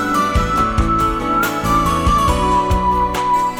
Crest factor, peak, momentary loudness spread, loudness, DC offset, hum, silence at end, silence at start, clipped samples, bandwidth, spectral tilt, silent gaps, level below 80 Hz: 12 dB; -2 dBFS; 2 LU; -16 LUFS; under 0.1%; none; 0 s; 0 s; under 0.1%; over 20 kHz; -5.5 dB/octave; none; -24 dBFS